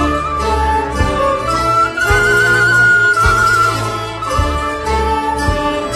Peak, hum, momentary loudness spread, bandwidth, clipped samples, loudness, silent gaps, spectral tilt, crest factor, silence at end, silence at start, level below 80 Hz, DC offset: 0 dBFS; none; 8 LU; 14 kHz; under 0.1%; -13 LUFS; none; -4.5 dB/octave; 14 dB; 0 s; 0 s; -24 dBFS; under 0.1%